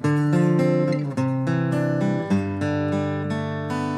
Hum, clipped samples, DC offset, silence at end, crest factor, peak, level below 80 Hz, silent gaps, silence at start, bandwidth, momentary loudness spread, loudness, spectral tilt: none; under 0.1%; under 0.1%; 0 s; 14 dB; -8 dBFS; -64 dBFS; none; 0 s; 11 kHz; 7 LU; -23 LUFS; -8 dB/octave